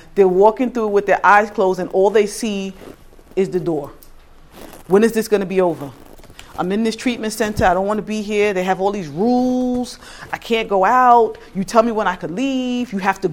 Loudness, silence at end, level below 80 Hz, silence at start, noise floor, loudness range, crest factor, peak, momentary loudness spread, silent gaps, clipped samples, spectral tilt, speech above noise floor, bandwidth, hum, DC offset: -17 LUFS; 0 s; -44 dBFS; 0.15 s; -42 dBFS; 4 LU; 18 dB; 0 dBFS; 13 LU; none; under 0.1%; -5.5 dB/octave; 25 dB; 17.5 kHz; none; under 0.1%